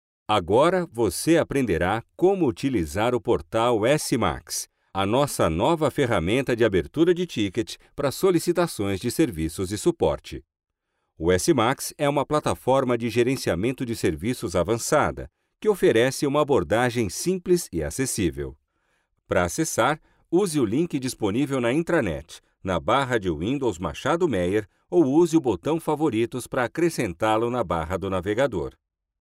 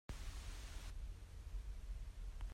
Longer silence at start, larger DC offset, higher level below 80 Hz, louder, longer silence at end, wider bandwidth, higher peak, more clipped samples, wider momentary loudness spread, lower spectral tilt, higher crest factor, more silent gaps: first, 0.3 s vs 0.1 s; neither; about the same, -46 dBFS vs -50 dBFS; first, -24 LUFS vs -53 LUFS; first, 0.5 s vs 0 s; about the same, 16 kHz vs 15.5 kHz; first, -10 dBFS vs -38 dBFS; neither; first, 7 LU vs 2 LU; about the same, -5 dB/octave vs -4.5 dB/octave; about the same, 14 dB vs 12 dB; neither